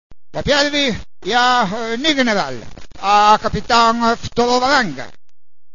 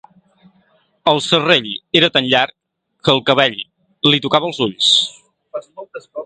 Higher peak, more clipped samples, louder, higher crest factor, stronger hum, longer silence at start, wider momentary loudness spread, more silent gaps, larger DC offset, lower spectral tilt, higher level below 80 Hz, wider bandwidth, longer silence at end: about the same, 0 dBFS vs 0 dBFS; neither; about the same, -15 LUFS vs -14 LUFS; about the same, 16 dB vs 18 dB; neither; second, 0.1 s vs 1.05 s; second, 13 LU vs 19 LU; neither; first, 3% vs under 0.1%; about the same, -3.5 dB/octave vs -3.5 dB/octave; first, -40 dBFS vs -60 dBFS; second, 7.4 kHz vs 9.4 kHz; first, 0.65 s vs 0 s